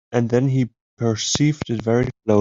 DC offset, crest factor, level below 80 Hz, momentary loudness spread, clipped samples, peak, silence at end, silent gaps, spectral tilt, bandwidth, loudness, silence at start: under 0.1%; 18 dB; -48 dBFS; 5 LU; under 0.1%; -2 dBFS; 0 s; 0.81-0.97 s; -5.5 dB/octave; 7.8 kHz; -21 LUFS; 0.1 s